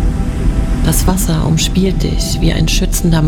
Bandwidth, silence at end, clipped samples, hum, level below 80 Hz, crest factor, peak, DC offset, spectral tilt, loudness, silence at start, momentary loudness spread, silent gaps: 18.5 kHz; 0 s; under 0.1%; none; -16 dBFS; 12 dB; 0 dBFS; under 0.1%; -5 dB/octave; -14 LUFS; 0 s; 4 LU; none